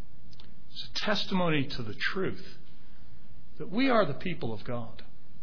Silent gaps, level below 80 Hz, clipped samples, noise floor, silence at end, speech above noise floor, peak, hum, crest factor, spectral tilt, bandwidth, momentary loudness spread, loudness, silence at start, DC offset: none; -54 dBFS; under 0.1%; -54 dBFS; 0 s; 24 dB; -12 dBFS; none; 20 dB; -6 dB/octave; 5.4 kHz; 19 LU; -31 LUFS; 0 s; 4%